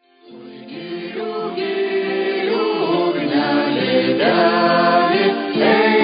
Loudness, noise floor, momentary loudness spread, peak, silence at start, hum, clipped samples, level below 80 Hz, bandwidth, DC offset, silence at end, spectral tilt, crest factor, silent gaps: -17 LUFS; -40 dBFS; 13 LU; -2 dBFS; 0.3 s; none; under 0.1%; -66 dBFS; 5.2 kHz; under 0.1%; 0 s; -10.5 dB/octave; 14 dB; none